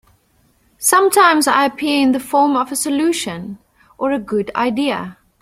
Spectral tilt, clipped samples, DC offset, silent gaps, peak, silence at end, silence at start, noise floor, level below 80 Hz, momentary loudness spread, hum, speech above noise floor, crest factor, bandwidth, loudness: -3 dB/octave; under 0.1%; under 0.1%; none; 0 dBFS; 0.3 s; 0.8 s; -58 dBFS; -56 dBFS; 13 LU; none; 42 dB; 16 dB; 16.5 kHz; -16 LUFS